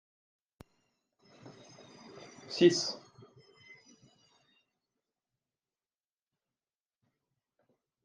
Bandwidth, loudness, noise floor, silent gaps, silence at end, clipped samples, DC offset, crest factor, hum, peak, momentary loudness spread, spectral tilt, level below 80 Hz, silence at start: 9.6 kHz; -29 LUFS; under -90 dBFS; none; 5.05 s; under 0.1%; under 0.1%; 28 dB; none; -12 dBFS; 29 LU; -4.5 dB/octave; -82 dBFS; 1.45 s